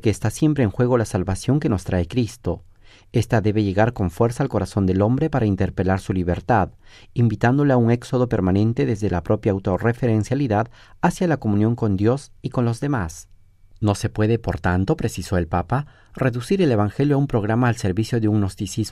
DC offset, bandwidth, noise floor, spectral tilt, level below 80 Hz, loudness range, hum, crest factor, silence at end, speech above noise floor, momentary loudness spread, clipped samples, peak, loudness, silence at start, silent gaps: under 0.1%; 13 kHz; -47 dBFS; -7.5 dB/octave; -42 dBFS; 3 LU; none; 16 dB; 0 s; 27 dB; 6 LU; under 0.1%; -4 dBFS; -21 LUFS; 0.05 s; none